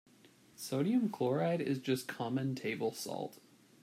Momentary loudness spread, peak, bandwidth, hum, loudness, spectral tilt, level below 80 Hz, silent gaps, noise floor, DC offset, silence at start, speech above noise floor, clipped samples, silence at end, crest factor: 9 LU; -20 dBFS; 16 kHz; none; -36 LUFS; -6 dB/octave; -82 dBFS; none; -63 dBFS; under 0.1%; 0.6 s; 28 dB; under 0.1%; 0.45 s; 16 dB